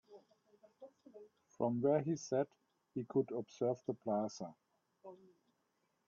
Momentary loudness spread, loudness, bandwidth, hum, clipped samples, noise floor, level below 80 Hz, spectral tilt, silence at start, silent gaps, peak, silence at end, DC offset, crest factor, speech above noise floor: 25 LU; -39 LUFS; 7.2 kHz; none; under 0.1%; -82 dBFS; -84 dBFS; -7.5 dB/octave; 0.1 s; none; -22 dBFS; 0.9 s; under 0.1%; 20 dB; 44 dB